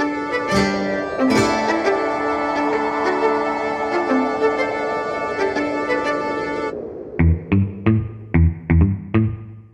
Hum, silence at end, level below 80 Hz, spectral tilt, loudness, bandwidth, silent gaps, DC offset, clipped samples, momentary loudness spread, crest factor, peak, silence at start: none; 0.05 s; -32 dBFS; -7 dB/octave; -20 LUFS; 11 kHz; none; under 0.1%; under 0.1%; 6 LU; 16 dB; -4 dBFS; 0 s